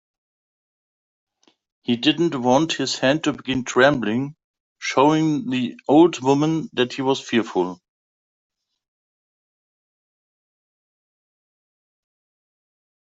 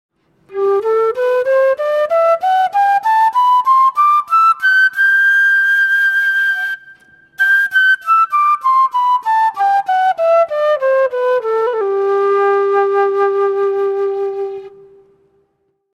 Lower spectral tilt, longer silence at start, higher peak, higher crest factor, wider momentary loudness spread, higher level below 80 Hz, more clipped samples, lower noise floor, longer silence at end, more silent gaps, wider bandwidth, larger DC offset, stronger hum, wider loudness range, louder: first, -5 dB/octave vs -2.5 dB/octave; first, 1.9 s vs 0.5 s; about the same, -2 dBFS vs -4 dBFS; first, 20 dB vs 10 dB; first, 9 LU vs 6 LU; first, -62 dBFS vs -70 dBFS; neither; first, under -90 dBFS vs -65 dBFS; first, 5.3 s vs 1.25 s; first, 4.44-4.54 s, 4.60-4.76 s vs none; second, 8 kHz vs 15 kHz; neither; neither; first, 8 LU vs 4 LU; second, -20 LUFS vs -13 LUFS